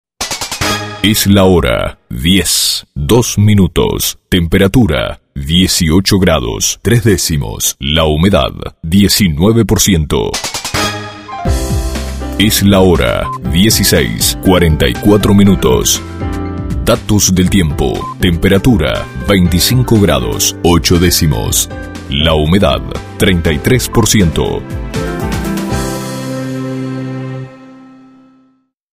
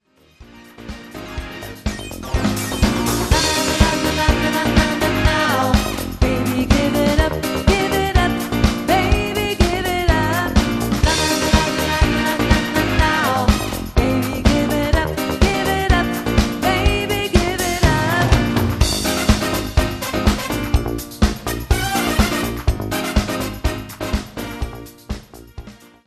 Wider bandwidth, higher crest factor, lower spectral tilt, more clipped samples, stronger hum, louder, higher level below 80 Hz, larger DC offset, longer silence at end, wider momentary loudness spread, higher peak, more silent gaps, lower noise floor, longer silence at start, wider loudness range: first, 16.5 kHz vs 14 kHz; second, 12 dB vs 18 dB; about the same, -4.5 dB/octave vs -4.5 dB/octave; neither; neither; first, -11 LUFS vs -18 LUFS; about the same, -24 dBFS vs -24 dBFS; neither; first, 1.1 s vs 0.3 s; about the same, 11 LU vs 11 LU; about the same, 0 dBFS vs 0 dBFS; neither; first, -54 dBFS vs -46 dBFS; second, 0.2 s vs 0.4 s; about the same, 4 LU vs 4 LU